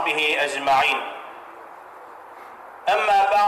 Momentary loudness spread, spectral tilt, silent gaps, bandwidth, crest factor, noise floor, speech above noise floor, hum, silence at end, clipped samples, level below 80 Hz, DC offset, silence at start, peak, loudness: 23 LU; -1.5 dB/octave; none; 16 kHz; 10 dB; -42 dBFS; 22 dB; none; 0 s; under 0.1%; -62 dBFS; under 0.1%; 0 s; -12 dBFS; -20 LUFS